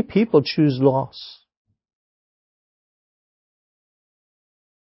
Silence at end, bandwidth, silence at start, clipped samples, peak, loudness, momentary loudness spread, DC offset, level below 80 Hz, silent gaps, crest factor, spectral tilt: 3.55 s; 5.8 kHz; 0 s; under 0.1%; -2 dBFS; -19 LUFS; 19 LU; under 0.1%; -62 dBFS; none; 22 dB; -11 dB/octave